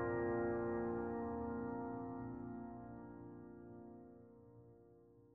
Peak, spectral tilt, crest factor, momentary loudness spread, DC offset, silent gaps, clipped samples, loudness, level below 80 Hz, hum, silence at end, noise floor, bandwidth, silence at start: -28 dBFS; -10 dB/octave; 16 dB; 23 LU; under 0.1%; none; under 0.1%; -44 LUFS; -66 dBFS; none; 0 s; -66 dBFS; 2.9 kHz; 0 s